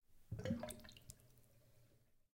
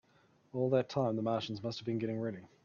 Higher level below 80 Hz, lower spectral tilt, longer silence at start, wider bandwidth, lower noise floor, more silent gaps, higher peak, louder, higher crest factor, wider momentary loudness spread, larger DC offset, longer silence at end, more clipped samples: first, -68 dBFS vs -76 dBFS; second, -5.5 dB/octave vs -7.5 dB/octave; second, 0.1 s vs 0.55 s; first, 16.5 kHz vs 7.2 kHz; first, -72 dBFS vs -68 dBFS; neither; second, -30 dBFS vs -18 dBFS; second, -49 LUFS vs -36 LUFS; first, 24 dB vs 18 dB; first, 16 LU vs 8 LU; neither; first, 0.4 s vs 0.15 s; neither